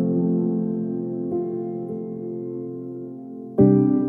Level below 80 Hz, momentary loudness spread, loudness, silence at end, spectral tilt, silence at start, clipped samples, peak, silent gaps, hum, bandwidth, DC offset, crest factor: -58 dBFS; 17 LU; -24 LUFS; 0 s; -14 dB/octave; 0 s; under 0.1%; -4 dBFS; none; none; 2.5 kHz; under 0.1%; 18 dB